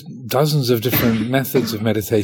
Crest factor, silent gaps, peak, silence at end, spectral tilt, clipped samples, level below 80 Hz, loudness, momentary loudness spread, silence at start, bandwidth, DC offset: 16 dB; none; -2 dBFS; 0 s; -5.5 dB/octave; under 0.1%; -48 dBFS; -18 LUFS; 4 LU; 0 s; 19 kHz; under 0.1%